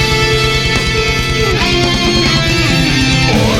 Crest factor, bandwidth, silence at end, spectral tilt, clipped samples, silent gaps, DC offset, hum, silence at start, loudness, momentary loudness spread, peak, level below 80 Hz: 12 dB; 17 kHz; 0 s; -4 dB/octave; under 0.1%; none; under 0.1%; none; 0 s; -11 LUFS; 2 LU; 0 dBFS; -22 dBFS